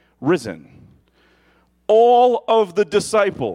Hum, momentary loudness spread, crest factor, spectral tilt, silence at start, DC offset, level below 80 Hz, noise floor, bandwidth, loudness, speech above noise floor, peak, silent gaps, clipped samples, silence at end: none; 18 LU; 14 dB; -5 dB/octave; 0.2 s; under 0.1%; -58 dBFS; -58 dBFS; 12.5 kHz; -16 LUFS; 42 dB; -4 dBFS; none; under 0.1%; 0 s